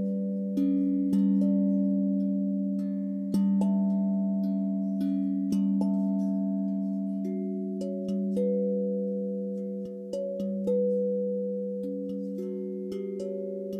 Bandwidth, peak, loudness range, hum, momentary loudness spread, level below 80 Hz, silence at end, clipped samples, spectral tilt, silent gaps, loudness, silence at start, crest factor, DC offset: 6.2 kHz; -16 dBFS; 4 LU; none; 9 LU; -72 dBFS; 0 s; under 0.1%; -10.5 dB/octave; none; -29 LUFS; 0 s; 12 dB; under 0.1%